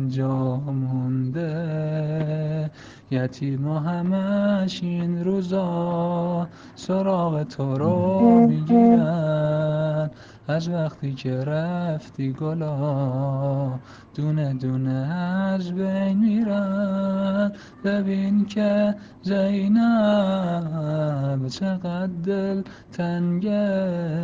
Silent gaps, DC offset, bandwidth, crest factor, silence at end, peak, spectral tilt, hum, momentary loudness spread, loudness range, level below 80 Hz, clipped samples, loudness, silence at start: none; under 0.1%; 7.4 kHz; 18 dB; 0 s; -4 dBFS; -8.5 dB/octave; none; 9 LU; 6 LU; -58 dBFS; under 0.1%; -23 LUFS; 0 s